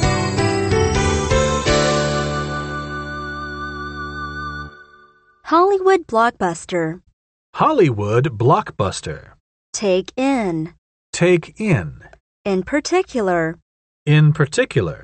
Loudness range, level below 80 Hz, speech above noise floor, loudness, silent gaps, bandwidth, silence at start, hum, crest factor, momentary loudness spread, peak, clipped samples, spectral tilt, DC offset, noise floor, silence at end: 4 LU; -36 dBFS; 34 dB; -19 LUFS; 7.13-7.53 s, 9.40-9.73 s, 10.78-11.13 s, 12.20-12.44 s, 13.62-14.06 s; 8.8 kHz; 0 s; none; 16 dB; 14 LU; -2 dBFS; under 0.1%; -5.5 dB/octave; under 0.1%; -51 dBFS; 0 s